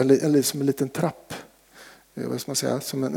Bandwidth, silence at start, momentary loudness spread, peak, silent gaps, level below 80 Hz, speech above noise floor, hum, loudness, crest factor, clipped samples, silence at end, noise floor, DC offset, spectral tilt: 20 kHz; 0 s; 20 LU; -6 dBFS; none; -68 dBFS; 26 dB; none; -24 LUFS; 20 dB; under 0.1%; 0 s; -50 dBFS; under 0.1%; -5 dB/octave